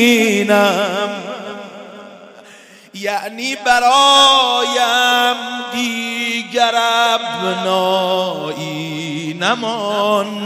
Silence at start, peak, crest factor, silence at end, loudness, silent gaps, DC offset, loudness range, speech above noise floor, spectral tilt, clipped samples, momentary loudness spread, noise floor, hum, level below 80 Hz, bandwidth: 0 s; 0 dBFS; 16 dB; 0 s; -15 LUFS; none; under 0.1%; 6 LU; 27 dB; -2.5 dB/octave; under 0.1%; 15 LU; -42 dBFS; none; -60 dBFS; 16 kHz